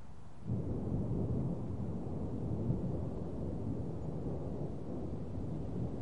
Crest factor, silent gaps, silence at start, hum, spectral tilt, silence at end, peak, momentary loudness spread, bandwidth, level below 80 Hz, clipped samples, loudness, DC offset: 16 dB; none; 0 s; none; -10.5 dB/octave; 0 s; -22 dBFS; 5 LU; 10.5 kHz; -50 dBFS; under 0.1%; -40 LUFS; 0.6%